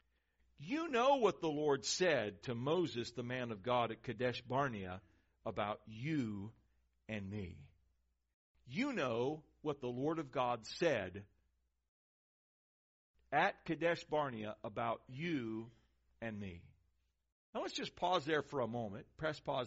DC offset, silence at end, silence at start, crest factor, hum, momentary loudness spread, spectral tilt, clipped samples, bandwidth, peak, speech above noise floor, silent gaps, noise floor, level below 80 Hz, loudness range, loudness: under 0.1%; 0 s; 0.6 s; 20 dB; none; 14 LU; -4 dB/octave; under 0.1%; 7.6 kHz; -20 dBFS; 42 dB; 8.33-8.55 s, 11.88-13.14 s, 17.32-17.53 s; -81 dBFS; -72 dBFS; 8 LU; -39 LUFS